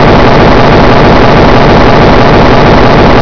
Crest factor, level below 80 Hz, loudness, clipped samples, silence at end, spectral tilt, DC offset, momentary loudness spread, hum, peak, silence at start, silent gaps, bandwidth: 4 dB; -12 dBFS; -3 LUFS; 30%; 0 s; -7 dB/octave; 20%; 0 LU; none; 0 dBFS; 0 s; none; 5.4 kHz